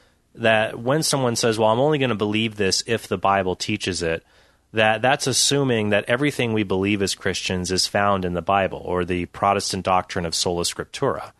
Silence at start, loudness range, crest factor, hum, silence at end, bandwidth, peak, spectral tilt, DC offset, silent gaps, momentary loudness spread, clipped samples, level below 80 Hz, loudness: 0.35 s; 2 LU; 20 dB; none; 0.1 s; 12.5 kHz; -2 dBFS; -3.5 dB/octave; under 0.1%; none; 6 LU; under 0.1%; -52 dBFS; -21 LUFS